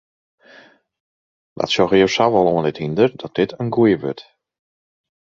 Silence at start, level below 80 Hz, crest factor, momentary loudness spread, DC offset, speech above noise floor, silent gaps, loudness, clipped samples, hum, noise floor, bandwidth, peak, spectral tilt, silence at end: 1.6 s; -54 dBFS; 18 dB; 9 LU; under 0.1%; 31 dB; none; -18 LUFS; under 0.1%; none; -48 dBFS; 7.6 kHz; -2 dBFS; -6 dB/octave; 1.2 s